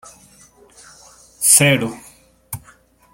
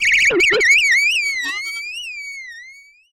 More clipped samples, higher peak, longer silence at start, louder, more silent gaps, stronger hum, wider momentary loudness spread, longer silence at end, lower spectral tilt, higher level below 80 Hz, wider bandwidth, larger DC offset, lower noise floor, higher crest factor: neither; first, 0 dBFS vs -4 dBFS; first, 1.4 s vs 0 s; about the same, -13 LUFS vs -14 LUFS; neither; neither; first, 23 LU vs 18 LU; first, 0.55 s vs 0.4 s; first, -2.5 dB/octave vs 0 dB/octave; about the same, -56 dBFS vs -52 dBFS; about the same, 17 kHz vs 16.5 kHz; neither; first, -51 dBFS vs -43 dBFS; first, 22 dB vs 14 dB